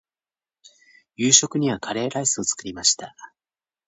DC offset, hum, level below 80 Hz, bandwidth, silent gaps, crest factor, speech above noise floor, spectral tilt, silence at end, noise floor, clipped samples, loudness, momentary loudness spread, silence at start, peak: under 0.1%; none; -62 dBFS; 9.2 kHz; none; 24 dB; over 68 dB; -2 dB/octave; 0.6 s; under -90 dBFS; under 0.1%; -20 LUFS; 11 LU; 1.2 s; 0 dBFS